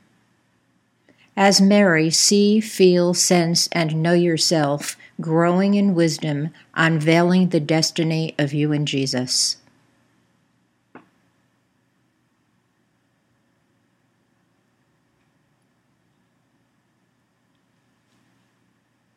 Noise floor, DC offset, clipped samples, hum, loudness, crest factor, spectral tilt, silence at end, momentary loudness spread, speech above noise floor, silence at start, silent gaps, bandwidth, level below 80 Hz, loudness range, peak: -66 dBFS; under 0.1%; under 0.1%; none; -18 LUFS; 20 dB; -4.5 dB/octave; 8.2 s; 9 LU; 48 dB; 1.35 s; none; 16 kHz; -74 dBFS; 8 LU; -2 dBFS